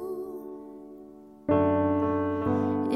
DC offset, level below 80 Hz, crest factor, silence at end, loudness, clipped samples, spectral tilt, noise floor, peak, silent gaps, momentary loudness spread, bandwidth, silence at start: under 0.1%; -58 dBFS; 16 dB; 0 s; -27 LUFS; under 0.1%; -9.5 dB/octave; -48 dBFS; -12 dBFS; none; 21 LU; 3.9 kHz; 0 s